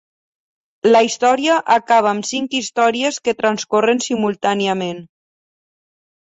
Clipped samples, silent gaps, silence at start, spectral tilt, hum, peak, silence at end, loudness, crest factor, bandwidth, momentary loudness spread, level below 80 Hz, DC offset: under 0.1%; none; 0.85 s; -3.5 dB/octave; none; -2 dBFS; 1.25 s; -17 LUFS; 16 dB; 8.2 kHz; 7 LU; -64 dBFS; under 0.1%